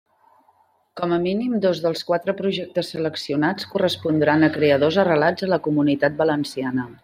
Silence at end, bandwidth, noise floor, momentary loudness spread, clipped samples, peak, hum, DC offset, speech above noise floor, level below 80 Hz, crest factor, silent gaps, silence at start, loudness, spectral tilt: 0.1 s; 15 kHz; -61 dBFS; 8 LU; under 0.1%; -4 dBFS; none; under 0.1%; 40 dB; -64 dBFS; 16 dB; none; 0.95 s; -21 LUFS; -6.5 dB/octave